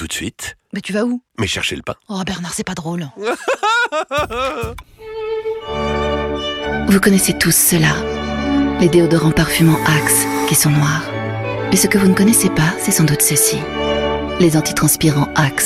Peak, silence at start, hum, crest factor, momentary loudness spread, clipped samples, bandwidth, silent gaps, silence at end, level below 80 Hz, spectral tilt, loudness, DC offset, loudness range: 0 dBFS; 0 s; none; 16 dB; 11 LU; under 0.1%; 16.5 kHz; none; 0 s; -36 dBFS; -4 dB/octave; -15 LUFS; under 0.1%; 7 LU